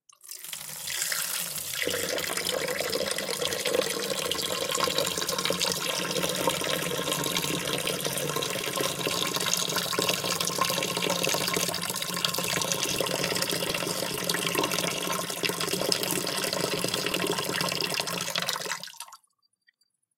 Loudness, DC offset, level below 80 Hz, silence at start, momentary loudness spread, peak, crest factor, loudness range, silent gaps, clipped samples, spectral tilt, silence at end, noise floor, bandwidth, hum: -27 LUFS; under 0.1%; -64 dBFS; 0.25 s; 4 LU; -6 dBFS; 24 dB; 2 LU; none; under 0.1%; -2 dB/octave; 1 s; -71 dBFS; 17 kHz; none